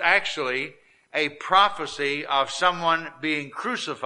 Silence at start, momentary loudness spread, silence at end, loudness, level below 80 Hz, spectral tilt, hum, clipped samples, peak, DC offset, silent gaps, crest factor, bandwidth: 0 s; 10 LU; 0 s; -24 LUFS; -64 dBFS; -2.5 dB/octave; none; under 0.1%; -4 dBFS; under 0.1%; none; 20 dB; 11.5 kHz